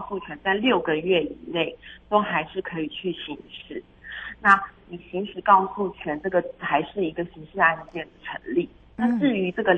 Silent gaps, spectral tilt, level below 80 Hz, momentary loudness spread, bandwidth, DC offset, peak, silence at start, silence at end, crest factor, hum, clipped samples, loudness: none; -7 dB/octave; -56 dBFS; 17 LU; 8.6 kHz; under 0.1%; -2 dBFS; 0 s; 0 s; 22 dB; none; under 0.1%; -24 LUFS